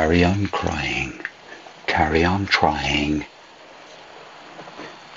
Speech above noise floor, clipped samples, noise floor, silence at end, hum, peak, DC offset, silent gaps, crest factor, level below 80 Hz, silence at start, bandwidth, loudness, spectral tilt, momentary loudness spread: 24 dB; under 0.1%; -44 dBFS; 0 s; none; -2 dBFS; under 0.1%; none; 22 dB; -42 dBFS; 0 s; 7.8 kHz; -21 LUFS; -5.5 dB/octave; 23 LU